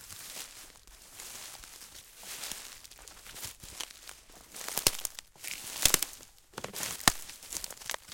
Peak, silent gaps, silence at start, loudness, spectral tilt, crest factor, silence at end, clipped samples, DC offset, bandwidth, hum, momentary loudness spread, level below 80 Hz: -2 dBFS; none; 0 s; -33 LUFS; -0.5 dB/octave; 36 dB; 0 s; under 0.1%; under 0.1%; 17 kHz; none; 21 LU; -56 dBFS